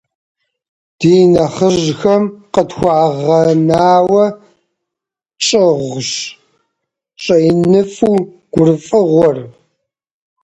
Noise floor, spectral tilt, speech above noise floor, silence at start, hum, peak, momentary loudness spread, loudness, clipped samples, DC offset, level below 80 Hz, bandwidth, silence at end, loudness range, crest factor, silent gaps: -83 dBFS; -6 dB/octave; 72 dB; 1 s; none; 0 dBFS; 8 LU; -12 LUFS; under 0.1%; under 0.1%; -48 dBFS; 10.5 kHz; 0.95 s; 4 LU; 14 dB; none